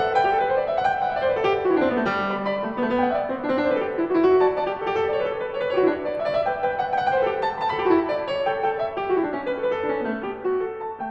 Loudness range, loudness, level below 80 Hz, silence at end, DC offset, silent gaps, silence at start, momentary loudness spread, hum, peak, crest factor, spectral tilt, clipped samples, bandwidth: 2 LU; -23 LUFS; -56 dBFS; 0 s; under 0.1%; none; 0 s; 6 LU; none; -6 dBFS; 16 dB; -7 dB/octave; under 0.1%; 7.8 kHz